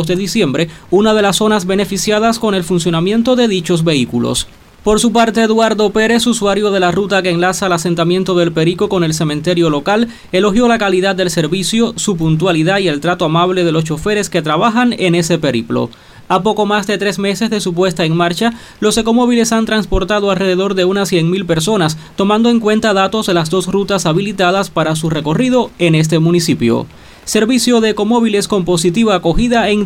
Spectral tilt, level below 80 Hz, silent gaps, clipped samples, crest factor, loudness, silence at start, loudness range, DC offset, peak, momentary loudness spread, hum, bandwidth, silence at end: -5 dB/octave; -36 dBFS; none; under 0.1%; 10 dB; -13 LUFS; 0 s; 2 LU; under 0.1%; -2 dBFS; 4 LU; none; 16.5 kHz; 0 s